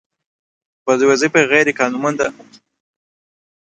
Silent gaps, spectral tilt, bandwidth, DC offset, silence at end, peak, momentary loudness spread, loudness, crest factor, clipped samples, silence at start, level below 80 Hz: none; -4 dB/octave; 9.2 kHz; under 0.1%; 1.3 s; 0 dBFS; 9 LU; -15 LUFS; 18 dB; under 0.1%; 0.85 s; -62 dBFS